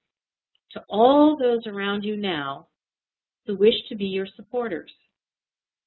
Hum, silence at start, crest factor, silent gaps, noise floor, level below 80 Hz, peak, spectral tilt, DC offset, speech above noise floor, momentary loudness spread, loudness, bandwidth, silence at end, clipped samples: none; 0.7 s; 22 dB; none; under -90 dBFS; -64 dBFS; -4 dBFS; -10 dB/octave; under 0.1%; over 68 dB; 18 LU; -23 LUFS; 4.3 kHz; 1.05 s; under 0.1%